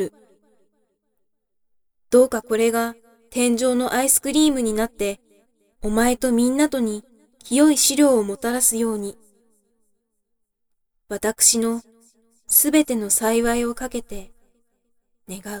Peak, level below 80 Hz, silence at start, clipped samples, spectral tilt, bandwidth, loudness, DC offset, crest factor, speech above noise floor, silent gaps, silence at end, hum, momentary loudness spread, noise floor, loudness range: -4 dBFS; -46 dBFS; 0 s; under 0.1%; -2.5 dB/octave; over 20 kHz; -19 LUFS; under 0.1%; 18 dB; 54 dB; none; 0 s; none; 17 LU; -73 dBFS; 4 LU